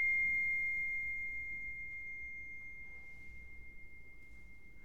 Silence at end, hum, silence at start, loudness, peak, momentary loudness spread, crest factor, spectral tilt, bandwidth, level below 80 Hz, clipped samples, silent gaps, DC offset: 0 s; none; 0 s; -37 LUFS; -28 dBFS; 24 LU; 12 dB; -4 dB/octave; 14 kHz; -60 dBFS; under 0.1%; none; 0.3%